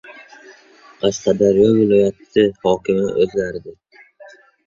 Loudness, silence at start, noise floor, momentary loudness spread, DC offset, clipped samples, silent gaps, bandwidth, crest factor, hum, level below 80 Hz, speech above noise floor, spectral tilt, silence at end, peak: -17 LUFS; 0.1 s; -46 dBFS; 9 LU; under 0.1%; under 0.1%; none; 7.4 kHz; 16 dB; none; -50 dBFS; 30 dB; -6 dB/octave; 0.95 s; -2 dBFS